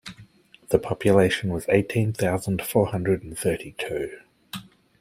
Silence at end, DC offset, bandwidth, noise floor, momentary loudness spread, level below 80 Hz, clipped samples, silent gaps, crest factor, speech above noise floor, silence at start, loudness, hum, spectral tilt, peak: 0.4 s; under 0.1%; 16 kHz; -51 dBFS; 19 LU; -52 dBFS; under 0.1%; none; 22 dB; 28 dB; 0.05 s; -24 LUFS; none; -6 dB/octave; -4 dBFS